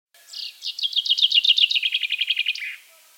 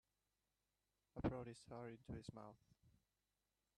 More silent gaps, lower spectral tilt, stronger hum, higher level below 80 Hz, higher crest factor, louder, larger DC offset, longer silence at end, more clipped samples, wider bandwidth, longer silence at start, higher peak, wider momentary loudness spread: neither; second, 8.5 dB/octave vs -7 dB/octave; second, none vs 50 Hz at -80 dBFS; second, under -90 dBFS vs -68 dBFS; second, 18 dB vs 26 dB; first, -19 LUFS vs -52 LUFS; neither; second, 0.4 s vs 0.85 s; neither; first, 17 kHz vs 11.5 kHz; second, 0.3 s vs 1.15 s; first, -6 dBFS vs -28 dBFS; first, 18 LU vs 14 LU